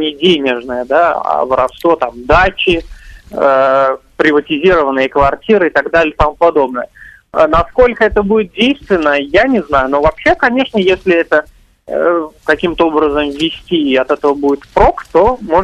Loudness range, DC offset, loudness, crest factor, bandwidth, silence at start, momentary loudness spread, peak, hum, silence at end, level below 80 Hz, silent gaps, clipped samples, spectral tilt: 2 LU; under 0.1%; -12 LUFS; 12 dB; 12.5 kHz; 0 s; 5 LU; 0 dBFS; none; 0 s; -30 dBFS; none; under 0.1%; -6 dB/octave